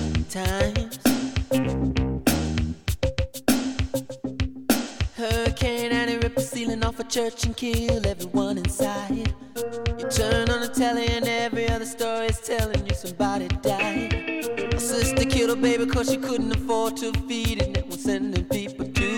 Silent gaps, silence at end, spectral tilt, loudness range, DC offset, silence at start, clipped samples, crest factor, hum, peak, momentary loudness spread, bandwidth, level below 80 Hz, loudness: none; 0 s; -5 dB/octave; 2 LU; 0.3%; 0 s; under 0.1%; 18 dB; none; -8 dBFS; 6 LU; 19 kHz; -34 dBFS; -25 LUFS